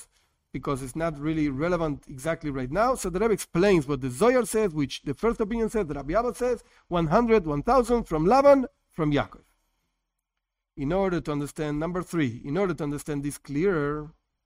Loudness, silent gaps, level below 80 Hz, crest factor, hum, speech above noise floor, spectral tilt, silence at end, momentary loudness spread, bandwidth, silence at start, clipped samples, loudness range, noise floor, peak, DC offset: -26 LUFS; none; -46 dBFS; 18 dB; none; 59 dB; -6.5 dB/octave; 0.35 s; 10 LU; 16 kHz; 0 s; under 0.1%; 7 LU; -84 dBFS; -8 dBFS; under 0.1%